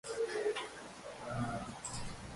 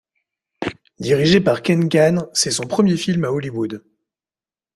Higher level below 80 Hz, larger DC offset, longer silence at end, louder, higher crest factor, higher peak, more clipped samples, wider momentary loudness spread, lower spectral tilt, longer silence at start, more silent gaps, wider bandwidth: second, -58 dBFS vs -52 dBFS; neither; second, 0 s vs 0.95 s; second, -41 LUFS vs -18 LUFS; about the same, 16 dB vs 18 dB; second, -24 dBFS vs -2 dBFS; neither; second, 11 LU vs 14 LU; about the same, -4 dB/octave vs -5 dB/octave; second, 0.05 s vs 0.6 s; neither; second, 11.5 kHz vs 13.5 kHz